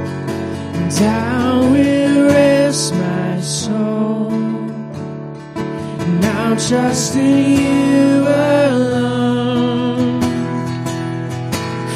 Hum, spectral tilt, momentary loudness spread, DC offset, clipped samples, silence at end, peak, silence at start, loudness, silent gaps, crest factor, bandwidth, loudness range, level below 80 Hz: none; -5.5 dB/octave; 11 LU; under 0.1%; under 0.1%; 0 s; 0 dBFS; 0 s; -15 LUFS; none; 16 dB; 15 kHz; 6 LU; -48 dBFS